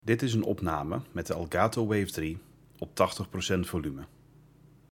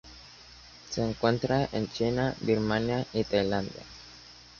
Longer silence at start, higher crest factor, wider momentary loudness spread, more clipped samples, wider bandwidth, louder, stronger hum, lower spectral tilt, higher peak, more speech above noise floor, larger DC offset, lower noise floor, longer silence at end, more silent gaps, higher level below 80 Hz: about the same, 0.05 s vs 0.05 s; about the same, 22 dB vs 20 dB; second, 13 LU vs 21 LU; neither; first, 17.5 kHz vs 7.2 kHz; about the same, -31 LUFS vs -29 LUFS; neither; about the same, -5.5 dB/octave vs -6 dB/octave; about the same, -8 dBFS vs -10 dBFS; first, 28 dB vs 23 dB; neither; first, -58 dBFS vs -51 dBFS; first, 0.85 s vs 0.15 s; neither; about the same, -56 dBFS vs -52 dBFS